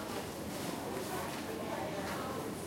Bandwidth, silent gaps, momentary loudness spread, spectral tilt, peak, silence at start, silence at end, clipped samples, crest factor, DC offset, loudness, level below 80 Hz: 16.5 kHz; none; 2 LU; -4.5 dB/octave; -26 dBFS; 0 s; 0 s; under 0.1%; 14 dB; under 0.1%; -39 LUFS; -64 dBFS